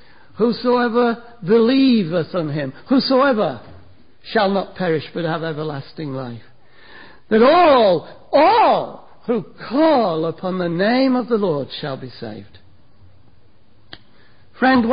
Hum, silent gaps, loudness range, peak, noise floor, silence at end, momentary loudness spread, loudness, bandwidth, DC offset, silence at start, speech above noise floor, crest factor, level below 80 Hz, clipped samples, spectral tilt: none; none; 8 LU; -4 dBFS; -54 dBFS; 0 s; 16 LU; -18 LUFS; 5.2 kHz; 0.7%; 0.4 s; 37 dB; 14 dB; -54 dBFS; under 0.1%; -11 dB/octave